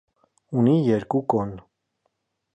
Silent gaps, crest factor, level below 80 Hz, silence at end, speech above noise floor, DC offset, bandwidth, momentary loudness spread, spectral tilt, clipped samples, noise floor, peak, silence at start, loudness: none; 18 dB; -58 dBFS; 0.95 s; 53 dB; under 0.1%; 8.4 kHz; 13 LU; -9.5 dB/octave; under 0.1%; -74 dBFS; -6 dBFS; 0.5 s; -23 LUFS